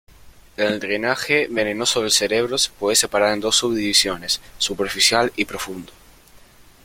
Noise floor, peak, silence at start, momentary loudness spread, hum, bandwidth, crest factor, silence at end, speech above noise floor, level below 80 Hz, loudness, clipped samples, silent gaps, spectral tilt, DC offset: -48 dBFS; -2 dBFS; 0.25 s; 8 LU; none; 16.5 kHz; 20 dB; 0.5 s; 28 dB; -50 dBFS; -19 LUFS; under 0.1%; none; -1.5 dB/octave; under 0.1%